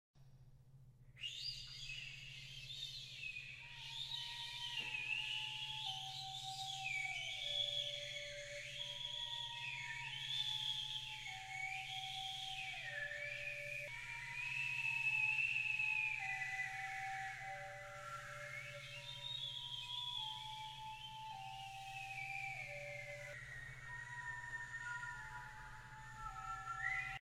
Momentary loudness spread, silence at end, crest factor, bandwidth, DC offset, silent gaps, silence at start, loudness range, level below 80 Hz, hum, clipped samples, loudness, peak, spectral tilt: 12 LU; 0 s; 18 dB; 16 kHz; under 0.1%; none; 0.15 s; 9 LU; -68 dBFS; none; under 0.1%; -43 LUFS; -28 dBFS; -1 dB/octave